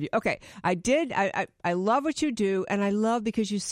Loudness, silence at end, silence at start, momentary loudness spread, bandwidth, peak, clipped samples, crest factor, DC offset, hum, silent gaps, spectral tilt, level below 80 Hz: -27 LUFS; 0 s; 0 s; 5 LU; 11.5 kHz; -12 dBFS; under 0.1%; 16 dB; under 0.1%; none; none; -5 dB/octave; -60 dBFS